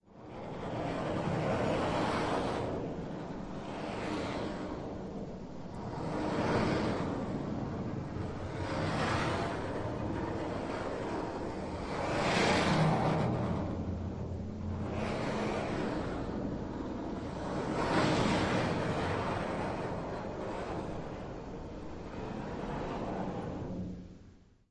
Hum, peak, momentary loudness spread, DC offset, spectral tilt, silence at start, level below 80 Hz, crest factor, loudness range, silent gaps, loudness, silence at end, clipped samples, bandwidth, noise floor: none; -16 dBFS; 12 LU; under 0.1%; -6 dB/octave; 0.1 s; -52 dBFS; 18 dB; 8 LU; none; -35 LUFS; 0.3 s; under 0.1%; 11.5 kHz; -58 dBFS